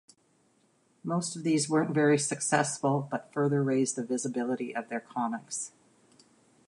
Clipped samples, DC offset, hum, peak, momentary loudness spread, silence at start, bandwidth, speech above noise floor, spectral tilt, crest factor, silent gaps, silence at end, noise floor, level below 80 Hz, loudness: under 0.1%; under 0.1%; none; -10 dBFS; 10 LU; 1.05 s; 11.5 kHz; 39 dB; -5 dB/octave; 20 dB; none; 1 s; -68 dBFS; -80 dBFS; -29 LUFS